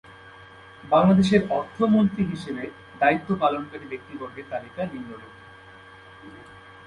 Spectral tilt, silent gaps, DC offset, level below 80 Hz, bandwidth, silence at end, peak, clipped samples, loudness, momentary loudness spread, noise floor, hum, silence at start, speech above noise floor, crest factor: -7.5 dB/octave; none; under 0.1%; -56 dBFS; 10.5 kHz; 0.15 s; -6 dBFS; under 0.1%; -23 LUFS; 26 LU; -47 dBFS; none; 0.25 s; 24 dB; 20 dB